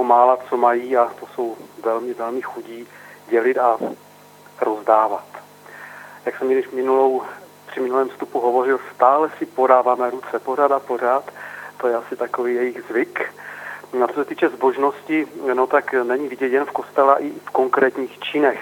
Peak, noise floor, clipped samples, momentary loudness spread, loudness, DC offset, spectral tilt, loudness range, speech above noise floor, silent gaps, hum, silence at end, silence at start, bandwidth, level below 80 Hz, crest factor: 0 dBFS; -46 dBFS; under 0.1%; 17 LU; -20 LUFS; under 0.1%; -5 dB/octave; 5 LU; 27 dB; none; 50 Hz at -55 dBFS; 0 s; 0 s; 18 kHz; -80 dBFS; 20 dB